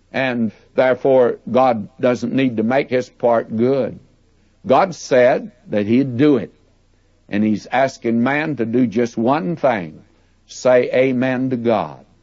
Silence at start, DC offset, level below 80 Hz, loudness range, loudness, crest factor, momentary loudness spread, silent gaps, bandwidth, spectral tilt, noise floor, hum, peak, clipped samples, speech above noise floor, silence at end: 0.15 s; under 0.1%; -58 dBFS; 2 LU; -17 LUFS; 14 dB; 8 LU; none; 7.8 kHz; -6.5 dB/octave; -56 dBFS; none; -2 dBFS; under 0.1%; 39 dB; 0.25 s